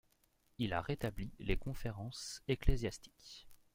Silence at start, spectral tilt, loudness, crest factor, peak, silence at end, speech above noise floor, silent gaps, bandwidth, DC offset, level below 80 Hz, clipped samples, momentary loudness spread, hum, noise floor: 0.6 s; -5.5 dB/octave; -41 LUFS; 22 dB; -18 dBFS; 0.2 s; 37 dB; none; 16 kHz; under 0.1%; -44 dBFS; under 0.1%; 17 LU; none; -75 dBFS